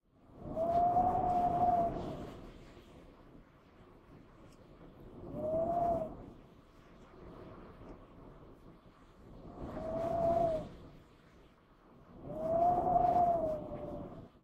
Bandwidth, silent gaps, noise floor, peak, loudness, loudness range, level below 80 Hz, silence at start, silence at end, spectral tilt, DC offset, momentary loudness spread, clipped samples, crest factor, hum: 7.8 kHz; none; -62 dBFS; -20 dBFS; -34 LUFS; 18 LU; -56 dBFS; 0.3 s; 0.15 s; -8.5 dB/octave; under 0.1%; 25 LU; under 0.1%; 18 dB; none